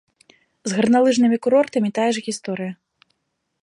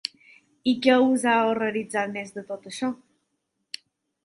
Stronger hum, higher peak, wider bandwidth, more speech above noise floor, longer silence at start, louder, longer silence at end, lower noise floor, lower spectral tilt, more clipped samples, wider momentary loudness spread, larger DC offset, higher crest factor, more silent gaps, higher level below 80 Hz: neither; about the same, -6 dBFS vs -4 dBFS; about the same, 11 kHz vs 11.5 kHz; about the same, 56 dB vs 54 dB; about the same, 0.65 s vs 0.65 s; first, -19 LUFS vs -24 LUFS; second, 0.9 s vs 1.3 s; about the same, -75 dBFS vs -77 dBFS; about the same, -5 dB/octave vs -4 dB/octave; neither; second, 13 LU vs 20 LU; neither; second, 16 dB vs 22 dB; neither; about the same, -68 dBFS vs -72 dBFS